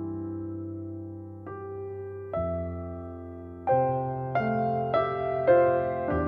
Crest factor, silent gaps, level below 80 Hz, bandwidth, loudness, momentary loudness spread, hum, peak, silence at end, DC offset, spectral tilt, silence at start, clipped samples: 18 dB; none; -52 dBFS; 5 kHz; -28 LUFS; 17 LU; none; -10 dBFS; 0 s; under 0.1%; -10.5 dB/octave; 0 s; under 0.1%